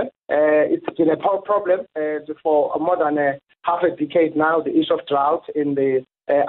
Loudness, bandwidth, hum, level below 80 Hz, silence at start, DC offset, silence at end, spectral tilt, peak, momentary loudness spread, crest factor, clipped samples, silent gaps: -20 LUFS; 4.2 kHz; none; -64 dBFS; 0 s; under 0.1%; 0 s; -10 dB/octave; -8 dBFS; 6 LU; 12 dB; under 0.1%; none